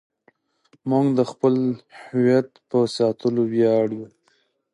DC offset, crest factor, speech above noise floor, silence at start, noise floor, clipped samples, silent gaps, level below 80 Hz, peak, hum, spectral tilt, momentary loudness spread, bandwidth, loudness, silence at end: under 0.1%; 16 dB; 45 dB; 0.85 s; -65 dBFS; under 0.1%; none; -70 dBFS; -6 dBFS; none; -7.5 dB/octave; 12 LU; 11 kHz; -21 LUFS; 0.7 s